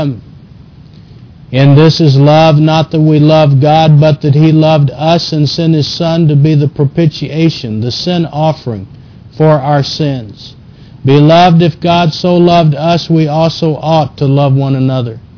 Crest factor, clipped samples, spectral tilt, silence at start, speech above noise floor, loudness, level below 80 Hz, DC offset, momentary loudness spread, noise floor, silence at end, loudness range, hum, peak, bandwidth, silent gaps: 8 dB; 0.3%; -7.5 dB/octave; 0 s; 27 dB; -9 LUFS; -40 dBFS; under 0.1%; 9 LU; -35 dBFS; 0.2 s; 6 LU; none; 0 dBFS; 5.4 kHz; none